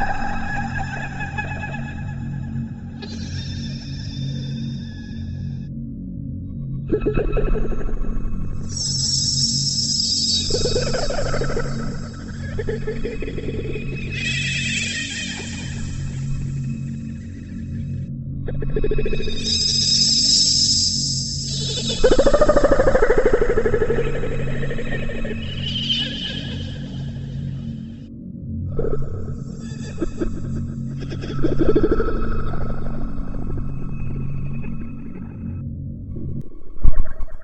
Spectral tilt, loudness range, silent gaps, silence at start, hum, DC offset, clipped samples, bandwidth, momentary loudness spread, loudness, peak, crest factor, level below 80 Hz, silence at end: -3.5 dB/octave; 13 LU; none; 0 s; none; under 0.1%; under 0.1%; 8.6 kHz; 15 LU; -22 LUFS; 0 dBFS; 20 dB; -28 dBFS; 0 s